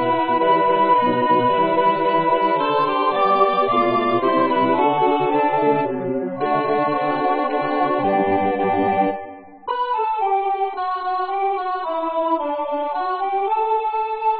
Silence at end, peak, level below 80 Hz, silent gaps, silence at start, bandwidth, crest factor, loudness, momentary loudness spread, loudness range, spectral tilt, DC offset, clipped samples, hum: 0 s; -4 dBFS; -56 dBFS; none; 0 s; 5 kHz; 16 dB; -19 LUFS; 7 LU; 5 LU; -10.5 dB/octave; 0.4%; under 0.1%; none